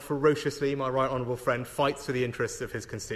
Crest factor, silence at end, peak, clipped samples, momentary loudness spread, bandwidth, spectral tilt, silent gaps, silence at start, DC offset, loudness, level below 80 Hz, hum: 16 dB; 0 s; -12 dBFS; under 0.1%; 8 LU; 13 kHz; -5 dB/octave; none; 0 s; under 0.1%; -29 LUFS; -54 dBFS; none